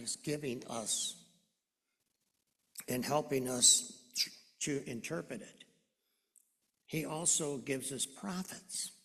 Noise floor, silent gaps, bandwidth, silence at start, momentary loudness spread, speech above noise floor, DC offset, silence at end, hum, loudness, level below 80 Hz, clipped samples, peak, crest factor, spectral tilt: -86 dBFS; none; 14 kHz; 0 s; 15 LU; 50 dB; under 0.1%; 0.1 s; none; -34 LUFS; -74 dBFS; under 0.1%; -10 dBFS; 28 dB; -2 dB/octave